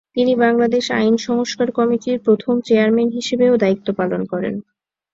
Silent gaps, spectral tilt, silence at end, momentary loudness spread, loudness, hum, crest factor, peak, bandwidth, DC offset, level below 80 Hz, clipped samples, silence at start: none; -5.5 dB/octave; 0.5 s; 7 LU; -17 LUFS; none; 14 dB; -2 dBFS; 7.8 kHz; under 0.1%; -58 dBFS; under 0.1%; 0.15 s